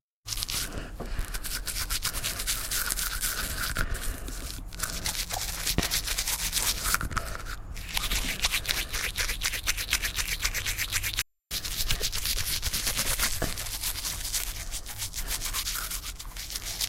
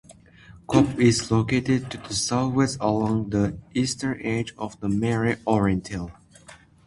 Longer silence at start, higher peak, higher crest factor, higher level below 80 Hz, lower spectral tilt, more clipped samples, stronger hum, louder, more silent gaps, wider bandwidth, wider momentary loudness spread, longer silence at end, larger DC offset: first, 0.25 s vs 0.1 s; second, -6 dBFS vs -2 dBFS; about the same, 26 dB vs 22 dB; first, -36 dBFS vs -48 dBFS; second, -1 dB/octave vs -5.5 dB/octave; neither; neither; second, -29 LUFS vs -24 LUFS; neither; first, 17 kHz vs 11.5 kHz; about the same, 9 LU vs 8 LU; second, 0 s vs 0.3 s; neither